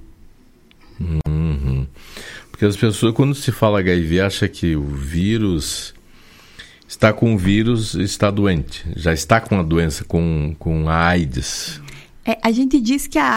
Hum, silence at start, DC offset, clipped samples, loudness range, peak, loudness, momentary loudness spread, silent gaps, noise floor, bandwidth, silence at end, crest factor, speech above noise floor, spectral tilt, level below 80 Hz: none; 0 s; under 0.1%; under 0.1%; 3 LU; 0 dBFS; -18 LUFS; 12 LU; none; -49 dBFS; 16.5 kHz; 0 s; 18 dB; 32 dB; -5.5 dB/octave; -32 dBFS